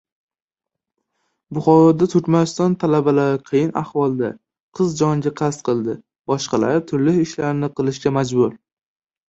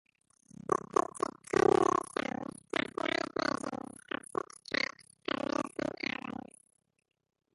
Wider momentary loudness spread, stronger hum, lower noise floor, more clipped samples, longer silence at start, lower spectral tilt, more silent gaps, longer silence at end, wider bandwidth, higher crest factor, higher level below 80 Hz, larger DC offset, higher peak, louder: second, 9 LU vs 14 LU; neither; first, -84 dBFS vs -58 dBFS; neither; first, 1.5 s vs 0.7 s; first, -7 dB/octave vs -4 dB/octave; first, 4.60-4.72 s, 6.19-6.24 s vs none; second, 0.7 s vs 1.25 s; second, 8 kHz vs 11.5 kHz; second, 16 dB vs 24 dB; first, -58 dBFS vs -68 dBFS; neither; first, -2 dBFS vs -12 dBFS; first, -19 LUFS vs -34 LUFS